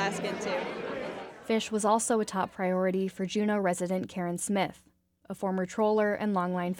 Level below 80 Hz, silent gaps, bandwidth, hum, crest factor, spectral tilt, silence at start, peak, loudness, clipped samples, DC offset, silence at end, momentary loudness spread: -68 dBFS; none; 17 kHz; none; 16 dB; -5 dB/octave; 0 s; -14 dBFS; -30 LUFS; under 0.1%; under 0.1%; 0 s; 9 LU